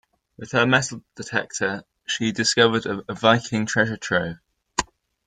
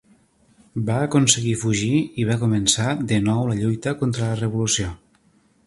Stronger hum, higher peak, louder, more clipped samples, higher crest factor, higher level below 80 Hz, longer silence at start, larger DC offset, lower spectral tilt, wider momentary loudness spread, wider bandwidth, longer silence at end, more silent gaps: neither; about the same, -2 dBFS vs 0 dBFS; about the same, -22 LUFS vs -21 LUFS; neither; about the same, 22 dB vs 22 dB; second, -54 dBFS vs -48 dBFS; second, 0.4 s vs 0.75 s; neither; about the same, -3.5 dB/octave vs -4.5 dB/octave; first, 14 LU vs 6 LU; second, 9.6 kHz vs 11.5 kHz; second, 0.45 s vs 0.7 s; neither